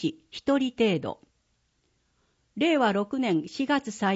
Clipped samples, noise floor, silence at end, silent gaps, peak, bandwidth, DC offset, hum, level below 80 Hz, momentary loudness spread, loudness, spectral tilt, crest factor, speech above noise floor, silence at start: under 0.1%; -72 dBFS; 0 s; none; -12 dBFS; 8 kHz; under 0.1%; none; -66 dBFS; 11 LU; -26 LUFS; -5.5 dB/octave; 16 dB; 46 dB; 0 s